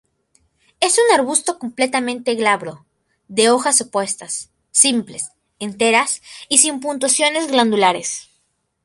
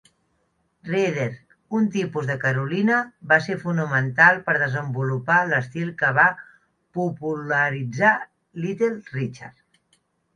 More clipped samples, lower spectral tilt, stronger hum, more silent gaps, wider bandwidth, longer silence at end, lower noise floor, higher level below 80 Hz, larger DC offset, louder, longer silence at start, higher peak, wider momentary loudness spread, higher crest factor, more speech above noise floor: neither; second, -1.5 dB/octave vs -6.5 dB/octave; neither; neither; first, 12 kHz vs 10 kHz; second, 0.65 s vs 0.85 s; about the same, -67 dBFS vs -69 dBFS; about the same, -66 dBFS vs -66 dBFS; neither; first, -16 LUFS vs -22 LUFS; about the same, 0.8 s vs 0.85 s; about the same, 0 dBFS vs -2 dBFS; about the same, 14 LU vs 12 LU; about the same, 18 dB vs 22 dB; about the same, 49 dB vs 47 dB